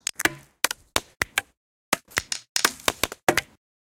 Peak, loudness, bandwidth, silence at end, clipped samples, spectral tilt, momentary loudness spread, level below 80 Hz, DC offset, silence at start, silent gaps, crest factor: -2 dBFS; -26 LUFS; 17 kHz; 0.4 s; under 0.1%; -1 dB/octave; 5 LU; -52 dBFS; under 0.1%; 0.2 s; 1.57-1.92 s, 2.49-2.55 s, 3.23-3.27 s; 26 dB